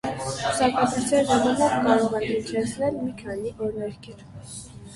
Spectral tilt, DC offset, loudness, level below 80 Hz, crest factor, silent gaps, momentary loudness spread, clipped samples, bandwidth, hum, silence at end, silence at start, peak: -4.5 dB/octave; under 0.1%; -24 LUFS; -52 dBFS; 18 dB; none; 18 LU; under 0.1%; 11.5 kHz; none; 0 s; 0.05 s; -6 dBFS